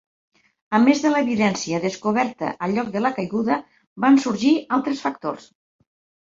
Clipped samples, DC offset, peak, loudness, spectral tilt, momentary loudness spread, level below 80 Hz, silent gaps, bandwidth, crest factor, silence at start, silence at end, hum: under 0.1%; under 0.1%; -4 dBFS; -21 LUFS; -5 dB/octave; 9 LU; -64 dBFS; 3.87-3.96 s; 7.8 kHz; 18 dB; 0.7 s; 0.9 s; none